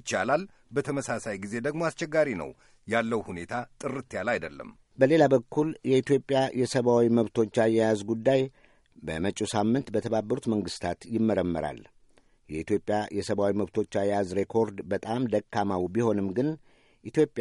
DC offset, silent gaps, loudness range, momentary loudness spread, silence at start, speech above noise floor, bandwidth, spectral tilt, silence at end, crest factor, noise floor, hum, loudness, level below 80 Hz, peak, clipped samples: under 0.1%; none; 5 LU; 11 LU; 0.05 s; 34 dB; 11.5 kHz; -6 dB/octave; 0 s; 20 dB; -61 dBFS; none; -28 LUFS; -60 dBFS; -8 dBFS; under 0.1%